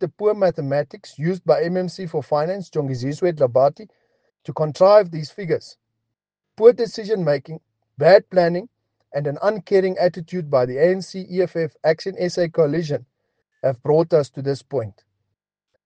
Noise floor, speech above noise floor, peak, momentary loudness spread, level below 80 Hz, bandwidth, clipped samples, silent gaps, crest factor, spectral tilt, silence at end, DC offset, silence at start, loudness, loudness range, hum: -80 dBFS; 61 dB; 0 dBFS; 13 LU; -64 dBFS; 9 kHz; under 0.1%; none; 20 dB; -7 dB/octave; 0.95 s; under 0.1%; 0 s; -20 LUFS; 3 LU; none